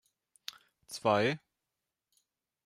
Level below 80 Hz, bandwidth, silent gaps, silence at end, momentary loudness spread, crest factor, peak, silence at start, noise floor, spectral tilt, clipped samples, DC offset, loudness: -78 dBFS; 15.5 kHz; none; 1.3 s; 18 LU; 22 dB; -14 dBFS; 0.9 s; -88 dBFS; -5 dB/octave; under 0.1%; under 0.1%; -31 LUFS